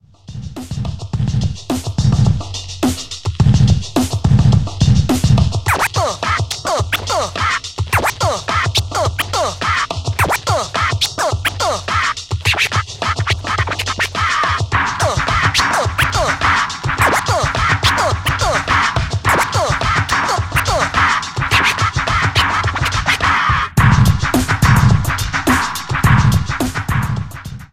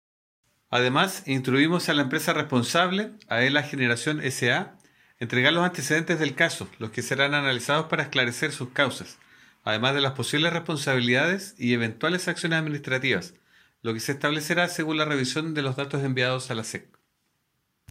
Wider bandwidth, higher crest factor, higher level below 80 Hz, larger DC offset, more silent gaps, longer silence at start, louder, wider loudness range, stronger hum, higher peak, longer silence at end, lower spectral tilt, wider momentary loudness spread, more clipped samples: about the same, 16.5 kHz vs 16 kHz; about the same, 16 dB vs 20 dB; first, -28 dBFS vs -70 dBFS; neither; neither; second, 0.3 s vs 0.7 s; first, -15 LUFS vs -25 LUFS; about the same, 3 LU vs 3 LU; neither; first, 0 dBFS vs -6 dBFS; second, 0.05 s vs 1.1 s; about the same, -4.5 dB/octave vs -4 dB/octave; about the same, 7 LU vs 8 LU; neither